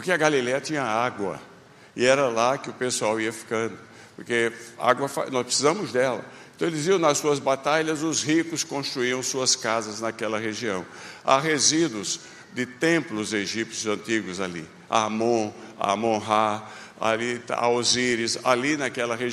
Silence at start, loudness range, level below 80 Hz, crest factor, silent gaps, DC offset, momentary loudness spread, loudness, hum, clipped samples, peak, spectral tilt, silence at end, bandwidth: 0 s; 2 LU; -68 dBFS; 22 dB; none; under 0.1%; 11 LU; -24 LUFS; none; under 0.1%; -4 dBFS; -3 dB/octave; 0 s; 14.5 kHz